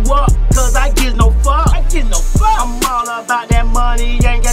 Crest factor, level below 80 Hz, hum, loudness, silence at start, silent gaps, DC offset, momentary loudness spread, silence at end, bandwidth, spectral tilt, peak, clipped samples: 10 dB; -12 dBFS; none; -14 LUFS; 0 s; none; under 0.1%; 4 LU; 0 s; 16 kHz; -4.5 dB/octave; 0 dBFS; under 0.1%